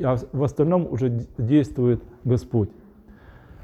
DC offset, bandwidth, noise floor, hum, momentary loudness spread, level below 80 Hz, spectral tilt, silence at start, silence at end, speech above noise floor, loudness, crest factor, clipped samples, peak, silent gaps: under 0.1%; 8.4 kHz; -48 dBFS; none; 5 LU; -46 dBFS; -9.5 dB/octave; 0 s; 0.55 s; 26 dB; -23 LUFS; 16 dB; under 0.1%; -8 dBFS; none